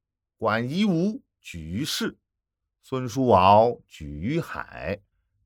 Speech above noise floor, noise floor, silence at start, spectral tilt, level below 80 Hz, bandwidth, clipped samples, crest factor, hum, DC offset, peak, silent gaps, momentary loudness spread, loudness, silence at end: 60 dB; -84 dBFS; 0.4 s; -6 dB/octave; -52 dBFS; 18.5 kHz; under 0.1%; 22 dB; none; under 0.1%; -4 dBFS; none; 20 LU; -24 LUFS; 0.5 s